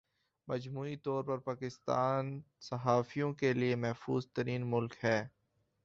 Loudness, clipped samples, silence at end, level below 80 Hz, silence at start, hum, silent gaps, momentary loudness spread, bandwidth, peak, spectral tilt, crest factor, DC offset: -36 LUFS; under 0.1%; 0.55 s; -72 dBFS; 0.45 s; none; none; 9 LU; 7.6 kHz; -16 dBFS; -6 dB/octave; 20 dB; under 0.1%